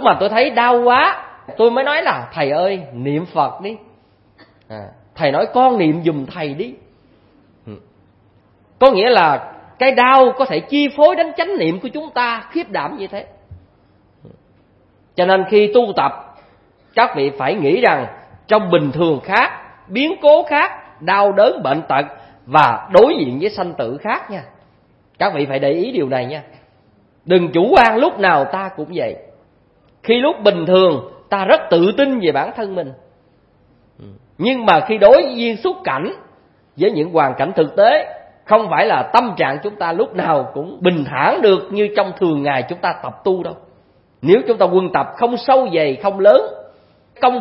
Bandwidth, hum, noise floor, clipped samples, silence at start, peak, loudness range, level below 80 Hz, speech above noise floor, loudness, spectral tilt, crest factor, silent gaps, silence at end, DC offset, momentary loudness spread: 6.2 kHz; none; -54 dBFS; under 0.1%; 0 s; 0 dBFS; 6 LU; -54 dBFS; 39 dB; -15 LUFS; -7.5 dB/octave; 16 dB; none; 0 s; under 0.1%; 13 LU